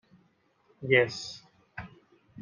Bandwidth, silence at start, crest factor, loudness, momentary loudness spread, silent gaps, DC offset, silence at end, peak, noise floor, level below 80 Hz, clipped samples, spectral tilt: 9.8 kHz; 0.8 s; 24 dB; -26 LUFS; 23 LU; none; under 0.1%; 0 s; -8 dBFS; -68 dBFS; -68 dBFS; under 0.1%; -5 dB/octave